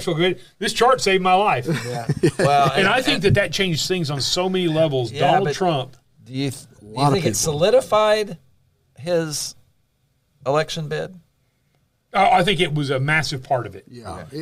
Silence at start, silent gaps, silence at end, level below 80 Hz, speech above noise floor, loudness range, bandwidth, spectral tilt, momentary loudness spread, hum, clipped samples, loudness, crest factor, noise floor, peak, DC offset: 0 s; none; 0 s; -48 dBFS; 46 dB; 7 LU; 16 kHz; -4.5 dB/octave; 14 LU; none; under 0.1%; -19 LUFS; 16 dB; -66 dBFS; -4 dBFS; under 0.1%